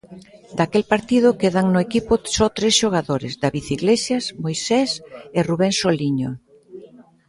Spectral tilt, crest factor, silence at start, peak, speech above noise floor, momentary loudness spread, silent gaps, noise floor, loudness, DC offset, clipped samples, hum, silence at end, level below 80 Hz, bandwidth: -4.5 dB/octave; 18 dB; 0.1 s; -2 dBFS; 25 dB; 9 LU; none; -45 dBFS; -20 LUFS; under 0.1%; under 0.1%; none; 0.45 s; -48 dBFS; 11.5 kHz